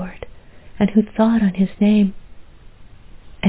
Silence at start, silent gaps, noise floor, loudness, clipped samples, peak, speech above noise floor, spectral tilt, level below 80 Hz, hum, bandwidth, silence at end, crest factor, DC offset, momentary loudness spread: 0 s; none; -41 dBFS; -17 LUFS; under 0.1%; -2 dBFS; 25 dB; -12 dB/octave; -44 dBFS; none; 4 kHz; 0 s; 18 dB; under 0.1%; 18 LU